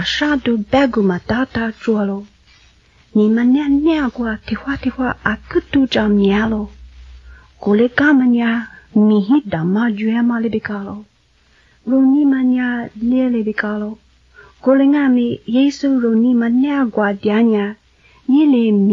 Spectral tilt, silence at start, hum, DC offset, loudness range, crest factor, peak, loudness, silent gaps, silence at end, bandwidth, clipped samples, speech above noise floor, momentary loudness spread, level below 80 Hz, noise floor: -7 dB/octave; 0 s; none; under 0.1%; 3 LU; 14 dB; -2 dBFS; -16 LUFS; none; 0 s; 7.2 kHz; under 0.1%; 40 dB; 10 LU; -44 dBFS; -54 dBFS